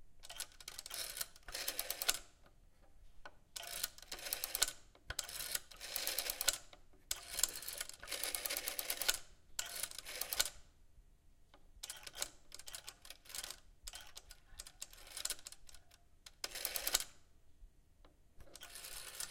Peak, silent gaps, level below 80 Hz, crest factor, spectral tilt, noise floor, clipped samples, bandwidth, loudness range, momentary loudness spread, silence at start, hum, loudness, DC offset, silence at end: -12 dBFS; none; -62 dBFS; 34 dB; 1 dB/octave; -65 dBFS; under 0.1%; 17 kHz; 10 LU; 18 LU; 0 s; none; -41 LUFS; under 0.1%; 0 s